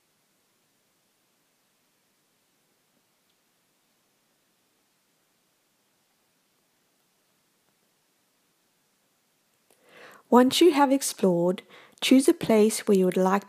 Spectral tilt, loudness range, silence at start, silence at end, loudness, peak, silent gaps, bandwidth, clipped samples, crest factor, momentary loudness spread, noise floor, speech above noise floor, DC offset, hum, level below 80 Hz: -4.5 dB/octave; 5 LU; 10.3 s; 0.1 s; -22 LUFS; -4 dBFS; none; 15.5 kHz; under 0.1%; 24 dB; 7 LU; -70 dBFS; 49 dB; under 0.1%; none; -76 dBFS